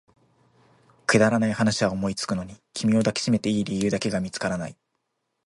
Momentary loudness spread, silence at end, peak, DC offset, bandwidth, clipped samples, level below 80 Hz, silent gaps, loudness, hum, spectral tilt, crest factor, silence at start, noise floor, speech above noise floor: 10 LU; 0.75 s; -6 dBFS; under 0.1%; 11.5 kHz; under 0.1%; -54 dBFS; none; -24 LUFS; none; -5 dB/octave; 20 dB; 1.1 s; -77 dBFS; 53 dB